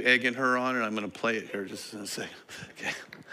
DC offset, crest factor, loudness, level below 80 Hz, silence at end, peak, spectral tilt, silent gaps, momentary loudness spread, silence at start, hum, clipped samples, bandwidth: under 0.1%; 22 dB; -30 LUFS; -76 dBFS; 0 s; -8 dBFS; -3 dB/octave; none; 15 LU; 0 s; none; under 0.1%; 16 kHz